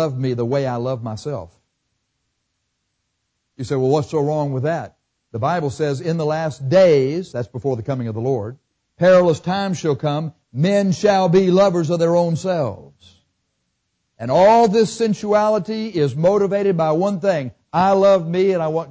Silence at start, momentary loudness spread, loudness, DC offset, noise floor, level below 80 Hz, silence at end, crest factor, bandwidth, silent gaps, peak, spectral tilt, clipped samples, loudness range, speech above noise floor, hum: 0 s; 12 LU; -18 LUFS; under 0.1%; -73 dBFS; -54 dBFS; 0 s; 14 dB; 8 kHz; none; -6 dBFS; -7 dB/octave; under 0.1%; 8 LU; 56 dB; none